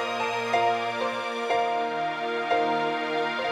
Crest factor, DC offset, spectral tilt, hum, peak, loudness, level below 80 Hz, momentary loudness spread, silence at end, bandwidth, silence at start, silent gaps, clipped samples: 14 dB; under 0.1%; -3.5 dB/octave; none; -12 dBFS; -26 LUFS; -74 dBFS; 4 LU; 0 s; 13 kHz; 0 s; none; under 0.1%